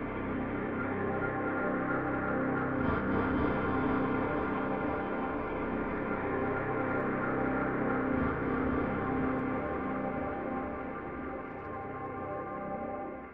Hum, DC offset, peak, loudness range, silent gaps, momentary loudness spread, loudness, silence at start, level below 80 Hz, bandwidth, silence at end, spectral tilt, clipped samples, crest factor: none; 0.2%; -18 dBFS; 5 LU; none; 8 LU; -33 LUFS; 0 s; -50 dBFS; 5 kHz; 0 s; -10.5 dB/octave; under 0.1%; 16 dB